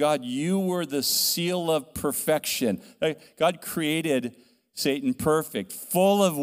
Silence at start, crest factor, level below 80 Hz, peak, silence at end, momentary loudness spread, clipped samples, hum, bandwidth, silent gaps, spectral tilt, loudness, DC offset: 0 s; 18 dB; -60 dBFS; -8 dBFS; 0 s; 7 LU; under 0.1%; none; 16 kHz; none; -4 dB/octave; -25 LUFS; under 0.1%